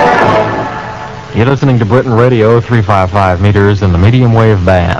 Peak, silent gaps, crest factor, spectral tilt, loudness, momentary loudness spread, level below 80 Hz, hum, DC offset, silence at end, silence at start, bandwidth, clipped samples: 0 dBFS; none; 8 dB; -8 dB/octave; -9 LUFS; 10 LU; -28 dBFS; none; 0.6%; 0 s; 0 s; 7.6 kHz; 3%